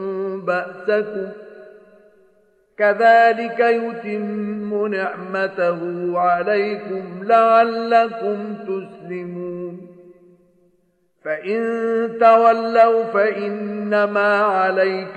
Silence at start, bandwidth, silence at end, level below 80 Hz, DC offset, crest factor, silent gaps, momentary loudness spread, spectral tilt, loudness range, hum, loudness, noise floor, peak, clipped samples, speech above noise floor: 0 s; 8.4 kHz; 0 s; -74 dBFS; under 0.1%; 18 dB; none; 15 LU; -7 dB/octave; 9 LU; none; -18 LUFS; -64 dBFS; -2 dBFS; under 0.1%; 46 dB